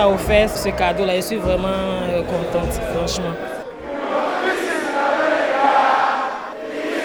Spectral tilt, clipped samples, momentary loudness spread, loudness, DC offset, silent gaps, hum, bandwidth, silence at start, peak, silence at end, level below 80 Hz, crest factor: -4.5 dB/octave; under 0.1%; 11 LU; -19 LUFS; under 0.1%; none; none; over 20 kHz; 0 s; -2 dBFS; 0 s; -36 dBFS; 18 dB